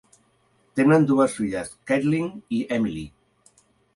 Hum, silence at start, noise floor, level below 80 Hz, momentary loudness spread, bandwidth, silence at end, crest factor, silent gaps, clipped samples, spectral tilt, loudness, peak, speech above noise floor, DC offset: none; 0.75 s; -64 dBFS; -56 dBFS; 14 LU; 11.5 kHz; 0.9 s; 18 dB; none; under 0.1%; -7 dB/octave; -23 LUFS; -6 dBFS; 42 dB; under 0.1%